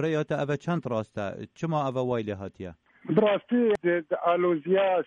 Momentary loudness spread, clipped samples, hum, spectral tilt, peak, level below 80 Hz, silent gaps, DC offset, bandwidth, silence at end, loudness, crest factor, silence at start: 12 LU; under 0.1%; none; -7.5 dB/octave; -12 dBFS; -66 dBFS; none; under 0.1%; 8.2 kHz; 0 s; -27 LUFS; 16 dB; 0 s